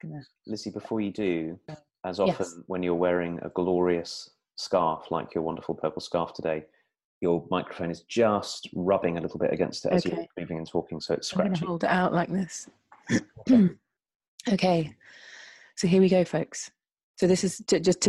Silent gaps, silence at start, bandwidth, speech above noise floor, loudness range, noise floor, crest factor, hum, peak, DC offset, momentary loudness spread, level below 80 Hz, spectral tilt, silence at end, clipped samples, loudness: 7.05-7.21 s, 14.15-14.20 s, 14.28-14.38 s, 17.03-17.14 s; 0.05 s; 12 kHz; 23 dB; 3 LU; -49 dBFS; 18 dB; none; -10 dBFS; under 0.1%; 14 LU; -62 dBFS; -5.5 dB/octave; 0 s; under 0.1%; -27 LUFS